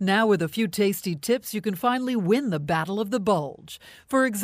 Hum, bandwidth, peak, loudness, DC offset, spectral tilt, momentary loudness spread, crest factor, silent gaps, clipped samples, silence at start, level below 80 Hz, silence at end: none; 16 kHz; -8 dBFS; -25 LUFS; under 0.1%; -5 dB/octave; 7 LU; 16 dB; none; under 0.1%; 0 s; -62 dBFS; 0 s